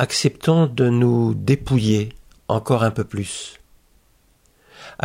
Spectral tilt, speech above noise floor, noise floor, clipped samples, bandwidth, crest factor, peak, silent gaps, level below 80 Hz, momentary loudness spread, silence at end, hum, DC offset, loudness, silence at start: -6 dB/octave; 39 dB; -58 dBFS; under 0.1%; 13.5 kHz; 16 dB; -4 dBFS; none; -46 dBFS; 14 LU; 0.15 s; none; under 0.1%; -20 LUFS; 0 s